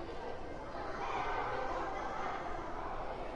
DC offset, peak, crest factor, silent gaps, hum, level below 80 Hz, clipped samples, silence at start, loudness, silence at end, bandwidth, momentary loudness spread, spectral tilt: under 0.1%; -26 dBFS; 14 dB; none; none; -50 dBFS; under 0.1%; 0 s; -40 LUFS; 0 s; 10 kHz; 7 LU; -5.5 dB/octave